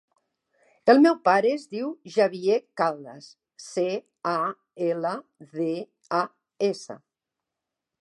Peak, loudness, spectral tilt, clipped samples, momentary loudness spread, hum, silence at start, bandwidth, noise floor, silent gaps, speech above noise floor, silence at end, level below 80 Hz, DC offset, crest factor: -6 dBFS; -25 LUFS; -5.5 dB/octave; under 0.1%; 18 LU; none; 0.85 s; 11.5 kHz; -86 dBFS; none; 62 dB; 1.05 s; -84 dBFS; under 0.1%; 20 dB